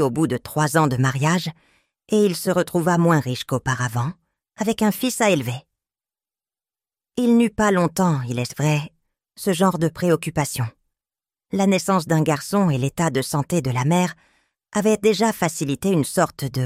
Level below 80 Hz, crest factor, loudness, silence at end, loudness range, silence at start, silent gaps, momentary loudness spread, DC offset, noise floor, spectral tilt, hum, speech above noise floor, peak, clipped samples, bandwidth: -54 dBFS; 20 dB; -21 LUFS; 0 s; 3 LU; 0 s; none; 8 LU; under 0.1%; under -90 dBFS; -5.5 dB/octave; none; over 70 dB; -2 dBFS; under 0.1%; 16 kHz